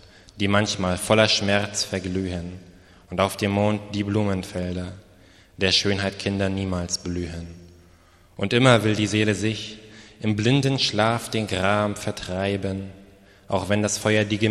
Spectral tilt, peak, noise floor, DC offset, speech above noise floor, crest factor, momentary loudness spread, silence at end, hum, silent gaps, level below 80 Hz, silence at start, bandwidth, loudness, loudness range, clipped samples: -4.5 dB/octave; -2 dBFS; -54 dBFS; under 0.1%; 31 dB; 22 dB; 13 LU; 0 s; none; none; -50 dBFS; 0.35 s; 13.5 kHz; -23 LUFS; 4 LU; under 0.1%